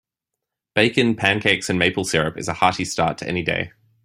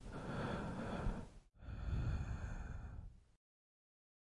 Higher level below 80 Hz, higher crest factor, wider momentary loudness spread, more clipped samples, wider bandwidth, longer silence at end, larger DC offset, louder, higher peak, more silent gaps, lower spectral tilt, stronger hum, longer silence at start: about the same, -52 dBFS vs -50 dBFS; about the same, 20 dB vs 16 dB; second, 7 LU vs 14 LU; neither; first, 16 kHz vs 11.5 kHz; second, 0.35 s vs 1.15 s; neither; first, -20 LUFS vs -46 LUFS; first, -2 dBFS vs -30 dBFS; neither; second, -4 dB/octave vs -7 dB/octave; neither; first, 0.75 s vs 0 s